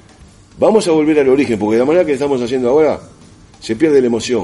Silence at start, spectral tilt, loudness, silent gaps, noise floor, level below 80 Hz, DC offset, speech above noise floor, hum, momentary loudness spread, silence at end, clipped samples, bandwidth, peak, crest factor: 0.55 s; -5.5 dB/octave; -13 LUFS; none; -42 dBFS; -48 dBFS; under 0.1%; 30 dB; none; 5 LU; 0 s; under 0.1%; 11.5 kHz; 0 dBFS; 14 dB